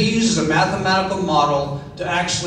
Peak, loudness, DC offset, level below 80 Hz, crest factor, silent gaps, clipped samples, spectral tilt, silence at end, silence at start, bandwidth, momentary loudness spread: -2 dBFS; -18 LUFS; under 0.1%; -44 dBFS; 16 dB; none; under 0.1%; -4 dB/octave; 0 s; 0 s; 10.5 kHz; 6 LU